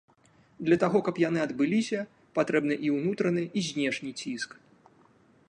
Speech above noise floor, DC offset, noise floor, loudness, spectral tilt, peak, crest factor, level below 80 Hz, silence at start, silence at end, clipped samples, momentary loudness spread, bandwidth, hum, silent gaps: 34 dB; under 0.1%; -62 dBFS; -28 LUFS; -5.5 dB/octave; -10 dBFS; 18 dB; -70 dBFS; 0.6 s; 1.05 s; under 0.1%; 9 LU; 10.5 kHz; none; none